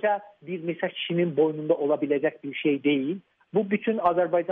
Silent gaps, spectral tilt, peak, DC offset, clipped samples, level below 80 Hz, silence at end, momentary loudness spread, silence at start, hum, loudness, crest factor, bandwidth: none; -4.5 dB/octave; -10 dBFS; under 0.1%; under 0.1%; -74 dBFS; 0 s; 9 LU; 0 s; none; -26 LUFS; 16 dB; 3.9 kHz